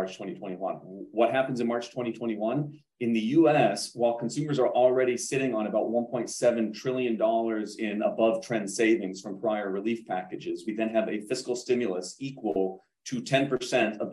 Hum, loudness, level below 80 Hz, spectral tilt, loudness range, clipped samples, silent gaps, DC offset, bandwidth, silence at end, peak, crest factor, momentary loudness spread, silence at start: none; -28 LUFS; -74 dBFS; -5 dB/octave; 5 LU; under 0.1%; none; under 0.1%; 12.5 kHz; 0 s; -10 dBFS; 18 dB; 11 LU; 0 s